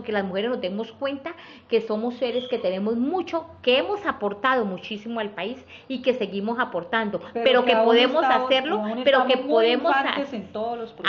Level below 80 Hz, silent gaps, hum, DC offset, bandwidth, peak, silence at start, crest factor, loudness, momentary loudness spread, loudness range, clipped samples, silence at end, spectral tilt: -66 dBFS; none; none; under 0.1%; 6.8 kHz; -6 dBFS; 0 s; 18 dB; -23 LUFS; 12 LU; 7 LU; under 0.1%; 0 s; -2 dB/octave